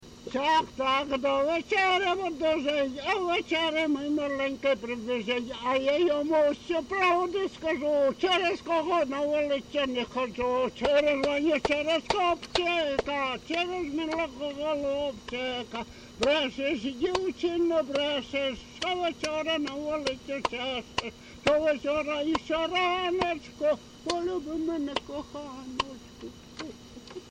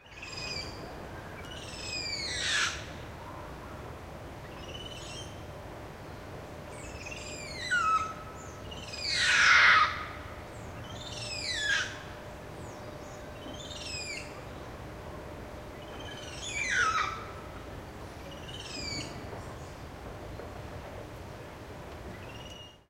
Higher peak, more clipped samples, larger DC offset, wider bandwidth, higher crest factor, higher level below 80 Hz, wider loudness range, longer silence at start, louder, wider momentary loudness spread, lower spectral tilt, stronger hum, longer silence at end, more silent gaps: about the same, -10 dBFS vs -10 dBFS; neither; neither; second, 10.5 kHz vs 16 kHz; second, 18 dB vs 26 dB; about the same, -56 dBFS vs -52 dBFS; second, 4 LU vs 17 LU; about the same, 0 s vs 0 s; about the same, -28 LUFS vs -30 LUFS; second, 9 LU vs 17 LU; first, -4 dB/octave vs -2 dB/octave; neither; about the same, 0 s vs 0.1 s; neither